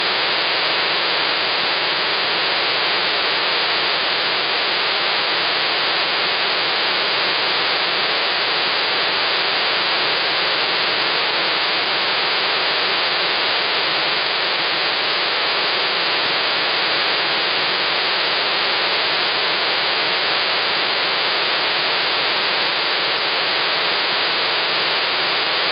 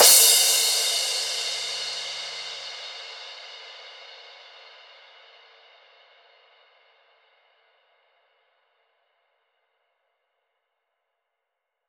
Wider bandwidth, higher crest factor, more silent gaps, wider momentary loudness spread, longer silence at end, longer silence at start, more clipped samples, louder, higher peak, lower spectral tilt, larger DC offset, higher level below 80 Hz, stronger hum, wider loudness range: second, 5.6 kHz vs over 20 kHz; second, 12 dB vs 24 dB; neither; second, 1 LU vs 27 LU; second, 0 s vs 7.7 s; about the same, 0 s vs 0 s; neither; first, -17 LUFS vs -20 LUFS; second, -8 dBFS vs -4 dBFS; first, -6.5 dB/octave vs 3.5 dB/octave; neither; first, -62 dBFS vs -80 dBFS; neither; second, 0 LU vs 27 LU